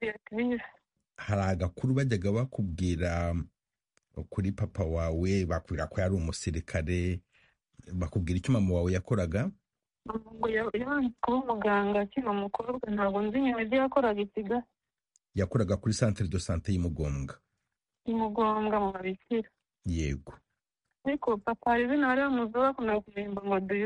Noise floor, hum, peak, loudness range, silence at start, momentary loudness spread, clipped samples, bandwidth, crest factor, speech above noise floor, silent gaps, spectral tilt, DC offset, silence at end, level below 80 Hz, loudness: -86 dBFS; none; -12 dBFS; 3 LU; 0 s; 10 LU; under 0.1%; 11 kHz; 20 dB; 56 dB; none; -7 dB/octave; under 0.1%; 0 s; -46 dBFS; -31 LUFS